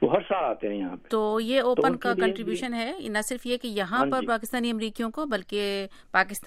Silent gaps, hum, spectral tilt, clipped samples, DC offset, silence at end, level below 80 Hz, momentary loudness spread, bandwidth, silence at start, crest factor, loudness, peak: none; none; -4 dB/octave; under 0.1%; under 0.1%; 0 s; -56 dBFS; 7 LU; 16 kHz; 0 s; 20 dB; -27 LUFS; -6 dBFS